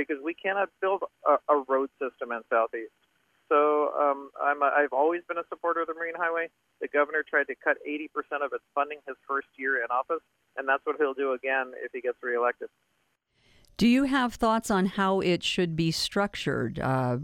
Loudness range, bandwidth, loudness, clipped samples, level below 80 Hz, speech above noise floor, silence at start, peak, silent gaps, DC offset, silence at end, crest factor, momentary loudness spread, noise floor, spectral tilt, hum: 4 LU; 16 kHz; -28 LUFS; under 0.1%; -60 dBFS; 44 dB; 0 s; -10 dBFS; none; under 0.1%; 0 s; 18 dB; 10 LU; -71 dBFS; -5 dB/octave; none